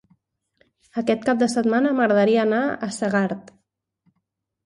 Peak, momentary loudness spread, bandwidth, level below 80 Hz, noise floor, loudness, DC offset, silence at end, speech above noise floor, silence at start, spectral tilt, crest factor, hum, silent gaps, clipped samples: -6 dBFS; 9 LU; 11.5 kHz; -66 dBFS; -77 dBFS; -21 LUFS; under 0.1%; 1.25 s; 56 dB; 0.95 s; -5.5 dB/octave; 16 dB; none; none; under 0.1%